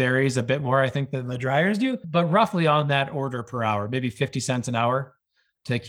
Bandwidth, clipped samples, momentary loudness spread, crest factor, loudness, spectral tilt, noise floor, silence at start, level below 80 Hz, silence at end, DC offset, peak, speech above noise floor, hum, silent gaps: 13.5 kHz; under 0.1%; 9 LU; 18 dB; -24 LUFS; -6 dB/octave; -61 dBFS; 0 s; -64 dBFS; 0 s; under 0.1%; -6 dBFS; 38 dB; none; none